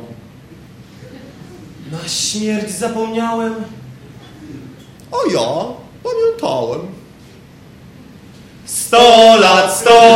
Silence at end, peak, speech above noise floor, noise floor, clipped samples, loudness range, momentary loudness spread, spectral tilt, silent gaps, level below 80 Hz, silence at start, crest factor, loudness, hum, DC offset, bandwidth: 0 s; 0 dBFS; 29 dB; -40 dBFS; 0.4%; 10 LU; 27 LU; -3 dB/octave; none; -50 dBFS; 0 s; 14 dB; -12 LUFS; none; under 0.1%; 16.5 kHz